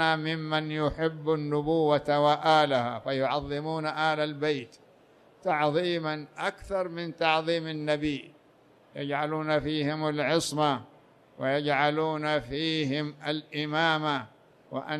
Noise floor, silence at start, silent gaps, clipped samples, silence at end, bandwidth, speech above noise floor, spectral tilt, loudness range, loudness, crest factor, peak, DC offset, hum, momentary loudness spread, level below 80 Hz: -60 dBFS; 0 s; none; under 0.1%; 0 s; 13 kHz; 32 dB; -5.5 dB/octave; 4 LU; -28 LUFS; 18 dB; -10 dBFS; under 0.1%; none; 9 LU; -58 dBFS